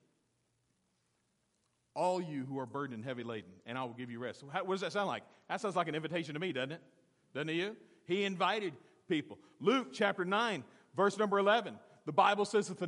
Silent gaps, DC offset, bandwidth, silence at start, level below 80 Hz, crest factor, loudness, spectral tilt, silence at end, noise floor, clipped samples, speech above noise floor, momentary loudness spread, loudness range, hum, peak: none; under 0.1%; 11.5 kHz; 1.95 s; -88 dBFS; 24 dB; -35 LUFS; -5 dB/octave; 0 s; -79 dBFS; under 0.1%; 44 dB; 14 LU; 8 LU; none; -14 dBFS